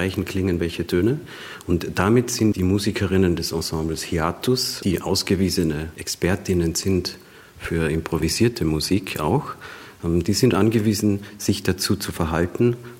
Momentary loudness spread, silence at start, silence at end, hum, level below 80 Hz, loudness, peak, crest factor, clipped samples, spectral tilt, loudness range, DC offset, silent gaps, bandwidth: 8 LU; 0 s; 0 s; none; -44 dBFS; -22 LUFS; -4 dBFS; 18 dB; under 0.1%; -5 dB/octave; 2 LU; under 0.1%; none; 16.5 kHz